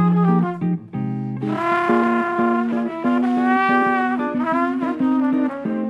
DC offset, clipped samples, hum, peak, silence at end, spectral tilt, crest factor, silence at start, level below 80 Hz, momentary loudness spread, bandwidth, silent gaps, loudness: under 0.1%; under 0.1%; none; -4 dBFS; 0 s; -8.5 dB/octave; 14 dB; 0 s; -62 dBFS; 8 LU; 7.4 kHz; none; -20 LUFS